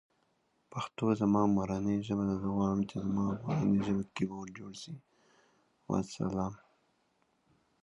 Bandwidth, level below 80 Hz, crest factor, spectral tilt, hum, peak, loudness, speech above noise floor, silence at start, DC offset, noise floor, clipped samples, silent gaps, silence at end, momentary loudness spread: 9.6 kHz; -60 dBFS; 18 dB; -7.5 dB/octave; none; -16 dBFS; -33 LUFS; 43 dB; 0.7 s; under 0.1%; -75 dBFS; under 0.1%; none; 1.3 s; 16 LU